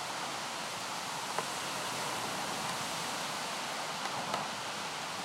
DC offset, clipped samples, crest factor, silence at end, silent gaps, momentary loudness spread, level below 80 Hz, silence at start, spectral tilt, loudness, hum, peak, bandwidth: under 0.1%; under 0.1%; 20 dB; 0 s; none; 2 LU; -76 dBFS; 0 s; -1.5 dB/octave; -36 LUFS; none; -18 dBFS; 16 kHz